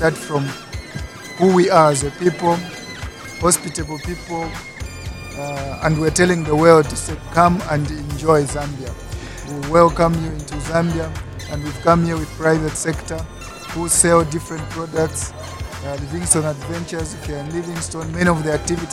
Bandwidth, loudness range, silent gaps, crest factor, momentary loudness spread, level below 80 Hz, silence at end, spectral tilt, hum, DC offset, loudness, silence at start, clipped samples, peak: 16 kHz; 6 LU; none; 18 dB; 17 LU; -36 dBFS; 0 s; -5 dB/octave; none; under 0.1%; -18 LUFS; 0 s; under 0.1%; 0 dBFS